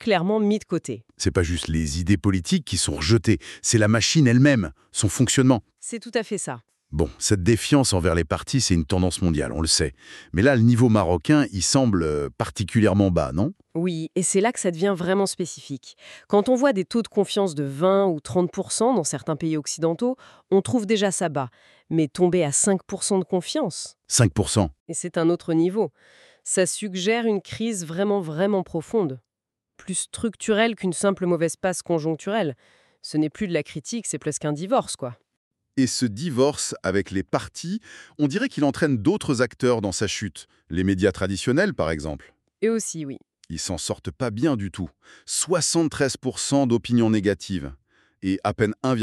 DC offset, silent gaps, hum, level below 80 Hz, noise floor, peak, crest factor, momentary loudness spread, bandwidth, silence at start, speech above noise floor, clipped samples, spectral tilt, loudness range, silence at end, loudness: under 0.1%; 24.80-24.86 s, 35.37-35.51 s; none; -44 dBFS; -86 dBFS; -4 dBFS; 18 dB; 11 LU; 13.5 kHz; 0 s; 64 dB; under 0.1%; -5 dB/octave; 6 LU; 0 s; -23 LUFS